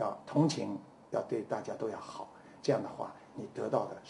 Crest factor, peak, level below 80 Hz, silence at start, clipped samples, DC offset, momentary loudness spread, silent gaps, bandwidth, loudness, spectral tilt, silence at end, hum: 20 dB; -16 dBFS; -76 dBFS; 0 s; under 0.1%; under 0.1%; 15 LU; none; 11.5 kHz; -36 LUFS; -6.5 dB/octave; 0 s; none